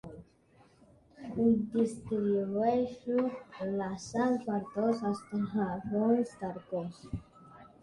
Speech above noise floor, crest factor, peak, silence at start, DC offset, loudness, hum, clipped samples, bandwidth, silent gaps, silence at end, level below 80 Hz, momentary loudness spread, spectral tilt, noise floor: 32 dB; 16 dB; -16 dBFS; 0.05 s; under 0.1%; -32 LUFS; none; under 0.1%; 11 kHz; none; 0.15 s; -60 dBFS; 12 LU; -7.5 dB/octave; -63 dBFS